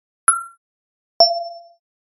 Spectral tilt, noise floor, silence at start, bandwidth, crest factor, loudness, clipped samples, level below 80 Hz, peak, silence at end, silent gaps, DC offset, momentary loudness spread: 2 dB/octave; under -90 dBFS; 0.3 s; 11.5 kHz; 22 dB; -17 LUFS; under 0.1%; -66 dBFS; 0 dBFS; 0.6 s; 0.57-1.20 s; under 0.1%; 18 LU